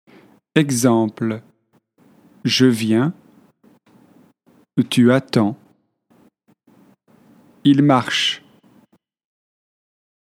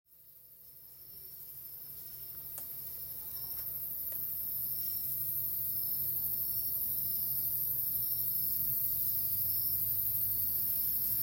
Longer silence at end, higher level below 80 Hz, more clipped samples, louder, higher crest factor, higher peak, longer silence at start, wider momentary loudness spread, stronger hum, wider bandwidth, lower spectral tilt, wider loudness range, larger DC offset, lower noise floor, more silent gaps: first, 2 s vs 0 s; second, -68 dBFS vs -62 dBFS; neither; first, -18 LUFS vs -31 LUFS; about the same, 20 dB vs 16 dB; first, 0 dBFS vs -18 dBFS; first, 0.55 s vs 0.1 s; second, 11 LU vs 14 LU; neither; about the same, 15.5 kHz vs 16.5 kHz; first, -5 dB/octave vs -2.5 dB/octave; second, 2 LU vs 11 LU; neither; about the same, -61 dBFS vs -58 dBFS; neither